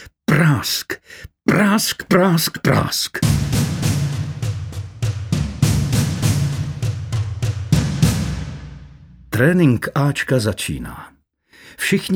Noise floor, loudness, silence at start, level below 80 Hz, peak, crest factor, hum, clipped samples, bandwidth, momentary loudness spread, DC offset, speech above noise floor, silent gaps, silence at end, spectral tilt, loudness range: -52 dBFS; -19 LUFS; 0 s; -36 dBFS; -2 dBFS; 16 dB; none; under 0.1%; 19.5 kHz; 13 LU; under 0.1%; 35 dB; none; 0 s; -5.5 dB/octave; 4 LU